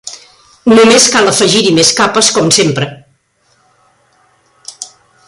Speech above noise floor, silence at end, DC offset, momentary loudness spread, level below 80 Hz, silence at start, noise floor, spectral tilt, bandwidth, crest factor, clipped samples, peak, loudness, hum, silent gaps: 47 dB; 0.4 s; under 0.1%; 22 LU; -50 dBFS; 0.05 s; -55 dBFS; -2.5 dB/octave; 16 kHz; 12 dB; under 0.1%; 0 dBFS; -8 LUFS; none; none